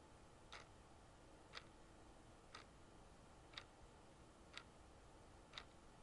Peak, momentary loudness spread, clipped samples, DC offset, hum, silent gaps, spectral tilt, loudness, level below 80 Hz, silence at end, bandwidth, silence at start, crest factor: -34 dBFS; 8 LU; under 0.1%; under 0.1%; none; none; -3.5 dB/octave; -62 LUFS; -70 dBFS; 0 s; 11 kHz; 0 s; 28 dB